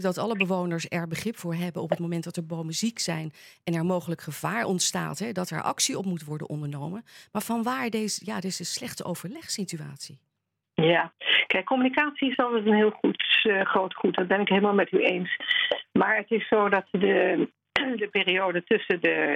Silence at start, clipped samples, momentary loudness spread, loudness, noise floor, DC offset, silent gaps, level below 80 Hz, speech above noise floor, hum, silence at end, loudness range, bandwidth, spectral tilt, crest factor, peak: 0 s; under 0.1%; 12 LU; -26 LUFS; -73 dBFS; under 0.1%; none; -70 dBFS; 47 dB; none; 0 s; 8 LU; 16.5 kHz; -4 dB/octave; 24 dB; -4 dBFS